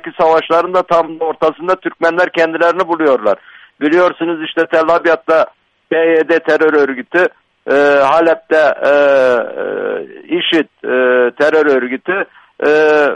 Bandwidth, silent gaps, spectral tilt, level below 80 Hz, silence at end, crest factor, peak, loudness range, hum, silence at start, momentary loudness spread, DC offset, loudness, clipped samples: 9 kHz; none; -5 dB/octave; -58 dBFS; 0 s; 12 dB; 0 dBFS; 2 LU; none; 0.05 s; 9 LU; under 0.1%; -13 LUFS; under 0.1%